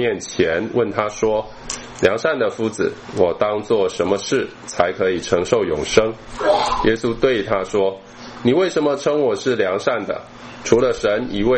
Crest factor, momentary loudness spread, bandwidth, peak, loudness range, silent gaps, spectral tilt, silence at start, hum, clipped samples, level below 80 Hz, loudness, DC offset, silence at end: 18 dB; 7 LU; 8.8 kHz; 0 dBFS; 2 LU; none; -4.5 dB/octave; 0 s; none; under 0.1%; -42 dBFS; -19 LUFS; under 0.1%; 0 s